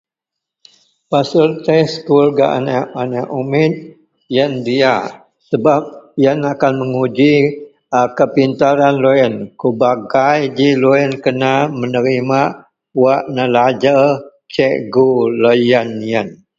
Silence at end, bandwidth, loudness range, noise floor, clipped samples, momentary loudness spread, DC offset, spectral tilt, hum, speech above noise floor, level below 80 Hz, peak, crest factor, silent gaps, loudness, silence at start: 0.25 s; 7.6 kHz; 3 LU; -82 dBFS; under 0.1%; 8 LU; under 0.1%; -7 dB/octave; none; 69 dB; -56 dBFS; 0 dBFS; 14 dB; none; -14 LUFS; 1.1 s